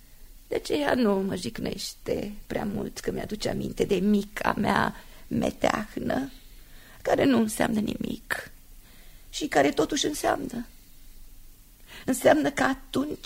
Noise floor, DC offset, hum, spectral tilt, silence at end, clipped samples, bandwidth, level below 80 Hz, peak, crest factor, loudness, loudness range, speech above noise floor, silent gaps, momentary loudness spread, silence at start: -49 dBFS; under 0.1%; none; -4.5 dB/octave; 0.05 s; under 0.1%; 16 kHz; -48 dBFS; -6 dBFS; 22 dB; -27 LUFS; 2 LU; 23 dB; none; 11 LU; 0.1 s